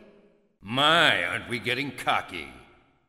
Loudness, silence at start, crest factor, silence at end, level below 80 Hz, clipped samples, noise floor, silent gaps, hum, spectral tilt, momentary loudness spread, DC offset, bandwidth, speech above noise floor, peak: -24 LUFS; 0.65 s; 22 dB; 0.5 s; -60 dBFS; under 0.1%; -60 dBFS; none; none; -3.5 dB/octave; 18 LU; under 0.1%; 16 kHz; 34 dB; -4 dBFS